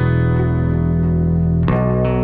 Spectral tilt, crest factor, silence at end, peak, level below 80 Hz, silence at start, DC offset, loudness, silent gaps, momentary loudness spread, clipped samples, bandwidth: -12 dB/octave; 12 dB; 0 s; -4 dBFS; -28 dBFS; 0 s; under 0.1%; -17 LUFS; none; 1 LU; under 0.1%; 4 kHz